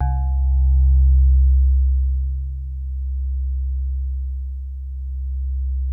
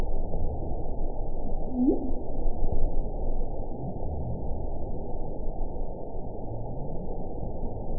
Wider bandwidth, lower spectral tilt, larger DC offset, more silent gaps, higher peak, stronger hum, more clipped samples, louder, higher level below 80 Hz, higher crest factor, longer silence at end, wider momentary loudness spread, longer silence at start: first, 1.6 kHz vs 1 kHz; second, -12 dB/octave vs -17 dB/octave; second, under 0.1% vs 1%; neither; about the same, -8 dBFS vs -10 dBFS; neither; neither; first, -21 LUFS vs -34 LUFS; first, -18 dBFS vs -30 dBFS; about the same, 10 dB vs 14 dB; about the same, 0 s vs 0 s; first, 14 LU vs 7 LU; about the same, 0 s vs 0 s